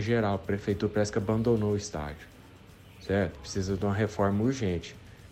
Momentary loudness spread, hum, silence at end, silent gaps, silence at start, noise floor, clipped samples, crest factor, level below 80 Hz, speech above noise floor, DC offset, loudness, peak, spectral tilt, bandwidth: 13 LU; none; 0 s; none; 0 s; -52 dBFS; under 0.1%; 16 dB; -50 dBFS; 23 dB; under 0.1%; -29 LUFS; -14 dBFS; -6.5 dB/octave; 14.5 kHz